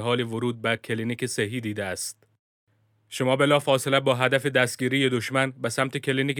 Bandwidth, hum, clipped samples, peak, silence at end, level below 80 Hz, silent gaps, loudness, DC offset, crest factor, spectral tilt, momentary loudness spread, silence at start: 19.5 kHz; none; under 0.1%; -6 dBFS; 0 s; -70 dBFS; 2.39-2.67 s; -24 LUFS; under 0.1%; 20 dB; -4.5 dB/octave; 9 LU; 0 s